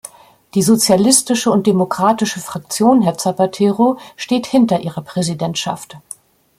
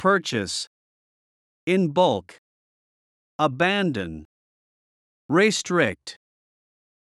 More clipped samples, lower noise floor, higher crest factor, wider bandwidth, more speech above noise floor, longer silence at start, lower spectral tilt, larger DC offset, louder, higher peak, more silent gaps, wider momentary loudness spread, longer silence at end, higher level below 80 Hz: neither; second, -39 dBFS vs under -90 dBFS; about the same, 16 dB vs 20 dB; first, 16.5 kHz vs 12 kHz; second, 24 dB vs over 68 dB; first, 0.55 s vs 0 s; about the same, -4.5 dB/octave vs -4.5 dB/octave; neither; first, -15 LUFS vs -23 LUFS; first, 0 dBFS vs -6 dBFS; second, none vs 0.67-1.67 s, 2.38-3.39 s, 4.25-5.29 s; second, 14 LU vs 18 LU; second, 0.6 s vs 1.05 s; first, -58 dBFS vs -64 dBFS